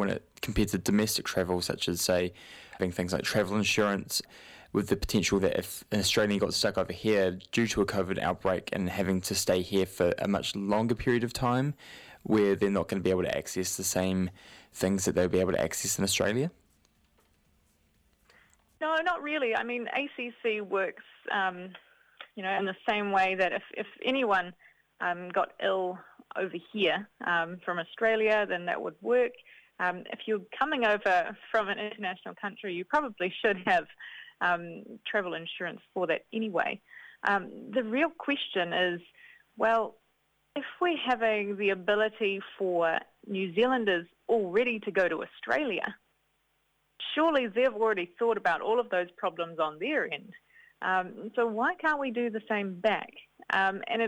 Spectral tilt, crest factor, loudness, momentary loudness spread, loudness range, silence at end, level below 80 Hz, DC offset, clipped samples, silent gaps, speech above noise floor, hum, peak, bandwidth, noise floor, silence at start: -4 dB/octave; 18 dB; -30 LUFS; 10 LU; 3 LU; 0 s; -56 dBFS; under 0.1%; under 0.1%; none; 44 dB; none; -12 dBFS; 17 kHz; -74 dBFS; 0 s